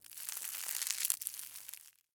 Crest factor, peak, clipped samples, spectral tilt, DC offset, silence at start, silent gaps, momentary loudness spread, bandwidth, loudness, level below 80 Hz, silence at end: 34 dB; -8 dBFS; under 0.1%; 4 dB/octave; under 0.1%; 0.05 s; none; 14 LU; over 20 kHz; -37 LUFS; -90 dBFS; 0.25 s